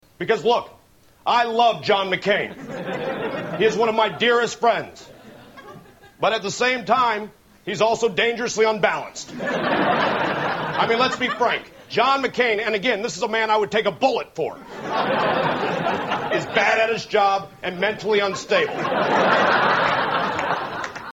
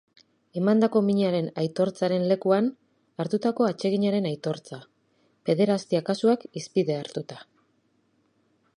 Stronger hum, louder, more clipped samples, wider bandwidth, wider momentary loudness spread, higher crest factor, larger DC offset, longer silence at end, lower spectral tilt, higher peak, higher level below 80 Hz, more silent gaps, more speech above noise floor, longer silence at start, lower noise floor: neither; first, -21 LUFS vs -25 LUFS; neither; first, 16.5 kHz vs 11 kHz; second, 10 LU vs 14 LU; about the same, 18 dB vs 18 dB; neither; second, 0 s vs 1.35 s; second, -4 dB/octave vs -7 dB/octave; first, -4 dBFS vs -8 dBFS; first, -60 dBFS vs -74 dBFS; neither; second, 24 dB vs 44 dB; second, 0.2 s vs 0.55 s; second, -45 dBFS vs -68 dBFS